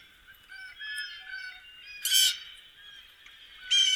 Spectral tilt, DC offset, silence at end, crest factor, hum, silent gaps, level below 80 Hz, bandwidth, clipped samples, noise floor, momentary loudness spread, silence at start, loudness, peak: 5.5 dB/octave; under 0.1%; 0 s; 22 dB; none; none; -70 dBFS; over 20 kHz; under 0.1%; -55 dBFS; 26 LU; 0.3 s; -27 LUFS; -10 dBFS